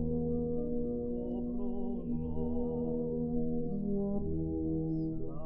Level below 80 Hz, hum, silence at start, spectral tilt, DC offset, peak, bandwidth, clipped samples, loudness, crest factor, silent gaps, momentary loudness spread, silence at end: -46 dBFS; none; 0 s; -14 dB/octave; under 0.1%; -22 dBFS; 2.9 kHz; under 0.1%; -36 LUFS; 12 dB; none; 3 LU; 0 s